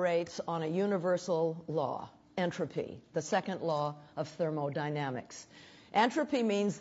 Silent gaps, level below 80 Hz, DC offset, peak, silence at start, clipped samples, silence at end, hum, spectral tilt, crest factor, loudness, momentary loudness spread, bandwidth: none; -74 dBFS; under 0.1%; -16 dBFS; 0 s; under 0.1%; 0 s; none; -5.5 dB/octave; 18 dB; -34 LUFS; 11 LU; 8 kHz